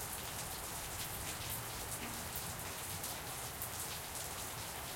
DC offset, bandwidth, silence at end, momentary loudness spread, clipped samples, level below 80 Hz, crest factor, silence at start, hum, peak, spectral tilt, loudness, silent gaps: under 0.1%; 17 kHz; 0 s; 1 LU; under 0.1%; -58 dBFS; 22 dB; 0 s; none; -22 dBFS; -2 dB/octave; -42 LUFS; none